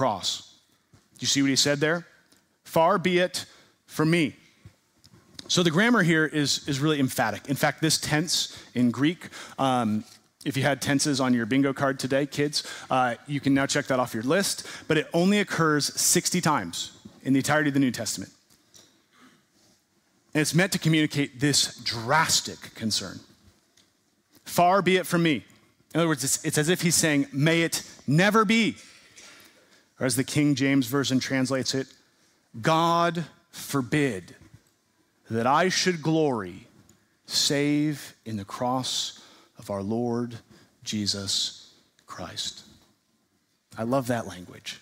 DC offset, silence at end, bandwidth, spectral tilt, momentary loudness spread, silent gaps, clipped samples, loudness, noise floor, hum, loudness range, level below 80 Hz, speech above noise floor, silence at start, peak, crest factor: under 0.1%; 0.05 s; 16 kHz; -4 dB/octave; 14 LU; none; under 0.1%; -25 LUFS; -70 dBFS; none; 6 LU; -64 dBFS; 46 dB; 0 s; -8 dBFS; 18 dB